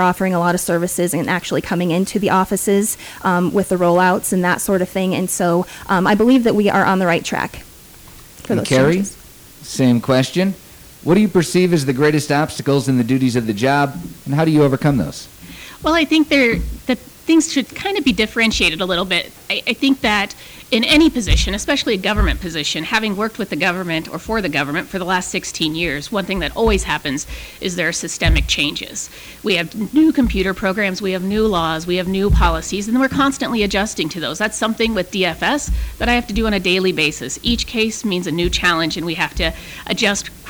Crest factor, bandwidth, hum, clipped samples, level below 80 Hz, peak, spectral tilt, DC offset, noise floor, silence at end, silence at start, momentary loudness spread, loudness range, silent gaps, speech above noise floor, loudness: 12 dB; over 20 kHz; none; under 0.1%; -30 dBFS; -4 dBFS; -4.5 dB/octave; under 0.1%; -41 dBFS; 0 s; 0 s; 8 LU; 3 LU; none; 24 dB; -17 LUFS